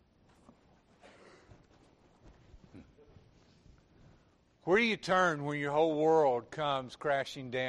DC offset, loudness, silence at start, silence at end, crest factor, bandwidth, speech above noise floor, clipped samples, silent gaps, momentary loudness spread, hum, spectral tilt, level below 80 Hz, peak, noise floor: under 0.1%; -31 LUFS; 2.55 s; 0 s; 18 dB; 11 kHz; 36 dB; under 0.1%; none; 8 LU; none; -5 dB/octave; -66 dBFS; -16 dBFS; -67 dBFS